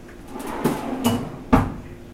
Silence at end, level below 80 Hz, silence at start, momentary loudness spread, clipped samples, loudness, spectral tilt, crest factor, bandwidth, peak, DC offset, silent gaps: 0 s; -36 dBFS; 0 s; 15 LU; under 0.1%; -24 LUFS; -6 dB/octave; 24 dB; 16.5 kHz; 0 dBFS; under 0.1%; none